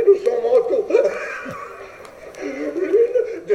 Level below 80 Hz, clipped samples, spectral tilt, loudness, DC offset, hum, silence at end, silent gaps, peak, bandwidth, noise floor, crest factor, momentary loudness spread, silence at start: -60 dBFS; under 0.1%; -5.5 dB/octave; -19 LUFS; under 0.1%; none; 0 s; none; -4 dBFS; 11.5 kHz; -39 dBFS; 16 dB; 20 LU; 0 s